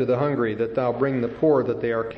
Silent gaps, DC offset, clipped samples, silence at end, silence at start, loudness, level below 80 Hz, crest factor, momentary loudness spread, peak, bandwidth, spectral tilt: none; under 0.1%; under 0.1%; 0 s; 0 s; -23 LUFS; -56 dBFS; 14 dB; 4 LU; -8 dBFS; 5.8 kHz; -9.5 dB/octave